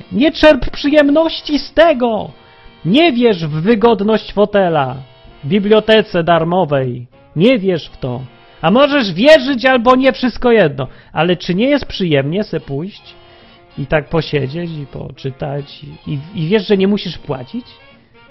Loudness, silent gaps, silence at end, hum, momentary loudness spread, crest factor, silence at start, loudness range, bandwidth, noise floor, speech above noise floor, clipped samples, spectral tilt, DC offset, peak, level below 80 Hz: -13 LUFS; none; 0.7 s; none; 16 LU; 14 dB; 0.1 s; 8 LU; 8.8 kHz; -43 dBFS; 29 dB; under 0.1%; -7 dB/octave; under 0.1%; 0 dBFS; -38 dBFS